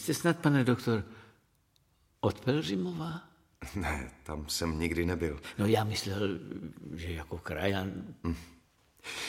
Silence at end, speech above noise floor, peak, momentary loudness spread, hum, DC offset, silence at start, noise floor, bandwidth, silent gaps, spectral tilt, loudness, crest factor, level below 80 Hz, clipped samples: 0 s; 38 dB; -12 dBFS; 14 LU; none; under 0.1%; 0 s; -70 dBFS; 16.5 kHz; none; -5.5 dB/octave; -33 LUFS; 20 dB; -50 dBFS; under 0.1%